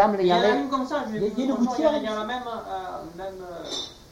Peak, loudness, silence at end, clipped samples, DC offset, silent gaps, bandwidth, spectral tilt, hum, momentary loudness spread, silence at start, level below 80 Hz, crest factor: -8 dBFS; -25 LUFS; 0.1 s; under 0.1%; under 0.1%; none; 16.5 kHz; -5 dB/octave; none; 16 LU; 0 s; -54 dBFS; 18 dB